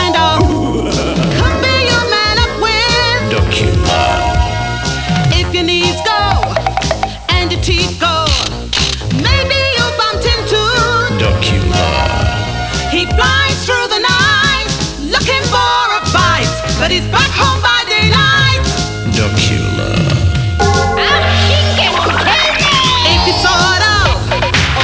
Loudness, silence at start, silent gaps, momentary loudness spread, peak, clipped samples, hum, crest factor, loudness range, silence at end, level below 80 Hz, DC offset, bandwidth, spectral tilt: -11 LUFS; 0 s; none; 6 LU; 0 dBFS; under 0.1%; none; 12 dB; 3 LU; 0 s; -22 dBFS; 0.2%; 8 kHz; -4 dB/octave